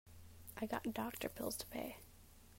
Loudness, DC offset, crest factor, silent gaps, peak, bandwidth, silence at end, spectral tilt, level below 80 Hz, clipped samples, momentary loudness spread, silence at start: -45 LUFS; under 0.1%; 20 dB; none; -26 dBFS; 16 kHz; 0 s; -4 dB/octave; -64 dBFS; under 0.1%; 19 LU; 0.05 s